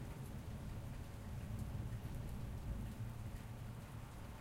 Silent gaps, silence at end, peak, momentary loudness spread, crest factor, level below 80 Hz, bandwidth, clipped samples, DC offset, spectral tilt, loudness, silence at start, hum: none; 0 s; -34 dBFS; 4 LU; 14 dB; -52 dBFS; 16 kHz; under 0.1%; under 0.1%; -6.5 dB/octave; -49 LUFS; 0 s; none